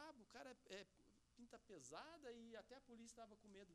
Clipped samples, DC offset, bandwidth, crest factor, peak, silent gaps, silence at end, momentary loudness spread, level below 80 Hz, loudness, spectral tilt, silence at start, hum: under 0.1%; under 0.1%; 13 kHz; 20 dB; -42 dBFS; none; 0 s; 7 LU; -84 dBFS; -62 LUFS; -3 dB/octave; 0 s; none